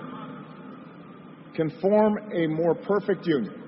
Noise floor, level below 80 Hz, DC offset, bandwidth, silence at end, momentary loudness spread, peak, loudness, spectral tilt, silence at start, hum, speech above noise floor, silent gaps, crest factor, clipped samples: -45 dBFS; -68 dBFS; under 0.1%; 5.8 kHz; 0 s; 23 LU; -10 dBFS; -25 LUFS; -11.5 dB/octave; 0 s; none; 21 dB; none; 18 dB; under 0.1%